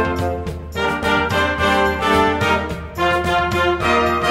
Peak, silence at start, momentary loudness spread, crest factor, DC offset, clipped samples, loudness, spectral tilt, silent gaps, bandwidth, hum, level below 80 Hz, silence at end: -4 dBFS; 0 s; 7 LU; 14 dB; under 0.1%; under 0.1%; -18 LUFS; -5 dB/octave; none; 16 kHz; none; -34 dBFS; 0 s